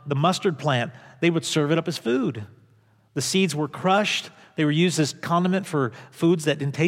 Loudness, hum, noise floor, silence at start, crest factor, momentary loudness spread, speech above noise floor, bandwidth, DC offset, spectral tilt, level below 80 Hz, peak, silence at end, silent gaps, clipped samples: -23 LUFS; none; -59 dBFS; 0.05 s; 16 dB; 7 LU; 36 dB; 16 kHz; under 0.1%; -5 dB/octave; -74 dBFS; -8 dBFS; 0 s; none; under 0.1%